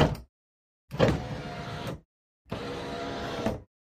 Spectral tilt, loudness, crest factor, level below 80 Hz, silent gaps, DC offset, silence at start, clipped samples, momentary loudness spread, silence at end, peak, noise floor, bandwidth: -6.5 dB/octave; -32 LUFS; 24 dB; -46 dBFS; 0.29-0.88 s, 2.05-2.45 s; under 0.1%; 0 s; under 0.1%; 15 LU; 0.35 s; -8 dBFS; under -90 dBFS; 15.5 kHz